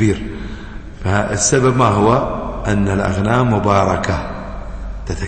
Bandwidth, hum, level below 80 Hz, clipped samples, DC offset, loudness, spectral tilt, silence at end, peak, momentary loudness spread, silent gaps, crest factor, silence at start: 8.8 kHz; none; -30 dBFS; under 0.1%; under 0.1%; -16 LUFS; -5.5 dB/octave; 0 s; -2 dBFS; 17 LU; none; 14 dB; 0 s